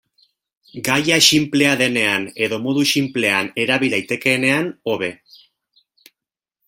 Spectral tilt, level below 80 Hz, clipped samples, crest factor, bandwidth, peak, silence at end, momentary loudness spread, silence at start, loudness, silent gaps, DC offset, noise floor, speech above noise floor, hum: -3 dB/octave; -60 dBFS; under 0.1%; 20 dB; 16.5 kHz; 0 dBFS; 1.55 s; 11 LU; 0.75 s; -17 LUFS; none; under 0.1%; -87 dBFS; 69 dB; none